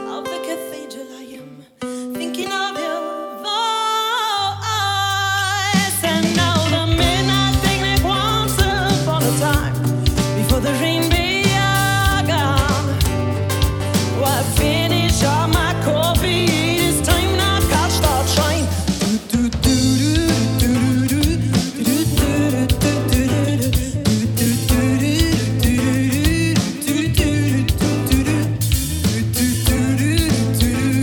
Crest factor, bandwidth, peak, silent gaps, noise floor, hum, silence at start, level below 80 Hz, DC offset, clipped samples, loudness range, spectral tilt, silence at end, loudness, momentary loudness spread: 16 dB; over 20 kHz; 0 dBFS; none; -38 dBFS; none; 0 s; -28 dBFS; under 0.1%; under 0.1%; 2 LU; -4.5 dB/octave; 0 s; -17 LUFS; 6 LU